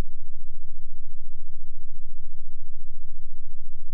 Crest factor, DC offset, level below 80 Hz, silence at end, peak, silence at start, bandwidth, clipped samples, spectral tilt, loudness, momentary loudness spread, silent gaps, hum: 4 dB; under 0.1%; -28 dBFS; 0 s; -12 dBFS; 0 s; 0.1 kHz; under 0.1%; -20.5 dB/octave; -44 LUFS; 0 LU; none; none